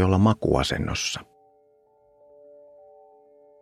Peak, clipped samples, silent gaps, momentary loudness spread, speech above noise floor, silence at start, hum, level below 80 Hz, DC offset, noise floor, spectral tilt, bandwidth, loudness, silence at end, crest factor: -6 dBFS; under 0.1%; none; 9 LU; 39 dB; 0 s; none; -44 dBFS; under 0.1%; -61 dBFS; -5.5 dB/octave; 14.5 kHz; -24 LUFS; 2.4 s; 22 dB